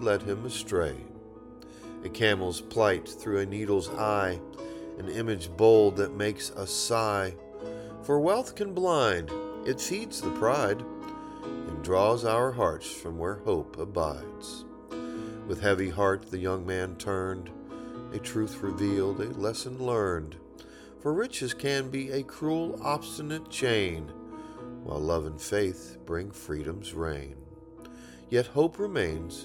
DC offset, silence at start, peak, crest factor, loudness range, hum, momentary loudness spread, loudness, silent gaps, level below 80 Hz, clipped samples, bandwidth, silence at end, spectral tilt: under 0.1%; 0 s; -10 dBFS; 20 dB; 6 LU; none; 16 LU; -30 LUFS; none; -52 dBFS; under 0.1%; 17 kHz; 0 s; -5 dB/octave